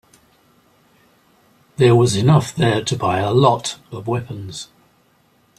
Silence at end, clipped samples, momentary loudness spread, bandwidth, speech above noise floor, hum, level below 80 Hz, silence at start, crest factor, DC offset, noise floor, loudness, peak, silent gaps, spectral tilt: 0.95 s; under 0.1%; 18 LU; 13 kHz; 41 dB; none; -52 dBFS; 1.8 s; 18 dB; under 0.1%; -58 dBFS; -17 LUFS; -2 dBFS; none; -6 dB/octave